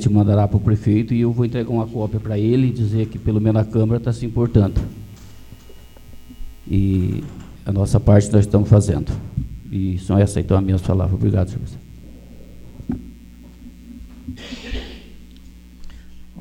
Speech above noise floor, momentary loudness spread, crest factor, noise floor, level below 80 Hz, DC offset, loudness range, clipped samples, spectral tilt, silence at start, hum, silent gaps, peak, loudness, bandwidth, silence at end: 24 dB; 19 LU; 20 dB; -41 dBFS; -34 dBFS; under 0.1%; 17 LU; under 0.1%; -8.5 dB/octave; 0 s; none; none; 0 dBFS; -19 LUFS; 11 kHz; 0 s